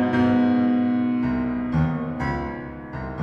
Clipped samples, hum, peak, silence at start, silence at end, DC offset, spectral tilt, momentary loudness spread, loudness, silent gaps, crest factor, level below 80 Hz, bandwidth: under 0.1%; none; -10 dBFS; 0 s; 0 s; under 0.1%; -9 dB/octave; 14 LU; -23 LUFS; none; 12 dB; -40 dBFS; 5.6 kHz